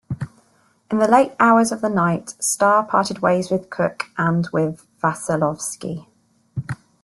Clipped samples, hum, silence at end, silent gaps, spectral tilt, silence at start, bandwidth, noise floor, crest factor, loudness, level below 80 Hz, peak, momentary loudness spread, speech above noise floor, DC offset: under 0.1%; none; 0.3 s; none; -5 dB/octave; 0.1 s; 12.5 kHz; -59 dBFS; 18 dB; -19 LUFS; -58 dBFS; -2 dBFS; 16 LU; 40 dB; under 0.1%